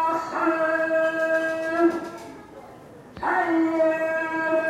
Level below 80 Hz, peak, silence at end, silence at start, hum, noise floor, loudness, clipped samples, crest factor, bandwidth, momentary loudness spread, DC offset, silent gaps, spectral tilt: -62 dBFS; -10 dBFS; 0 s; 0 s; none; -45 dBFS; -23 LUFS; under 0.1%; 14 dB; 12.5 kHz; 20 LU; under 0.1%; none; -5.5 dB/octave